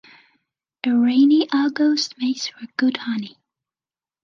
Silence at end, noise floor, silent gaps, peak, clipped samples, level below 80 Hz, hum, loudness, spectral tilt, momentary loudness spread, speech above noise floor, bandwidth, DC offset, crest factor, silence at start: 0.95 s; under -90 dBFS; none; -6 dBFS; under 0.1%; -76 dBFS; none; -20 LUFS; -3.5 dB/octave; 12 LU; over 71 dB; 7.4 kHz; under 0.1%; 14 dB; 0.85 s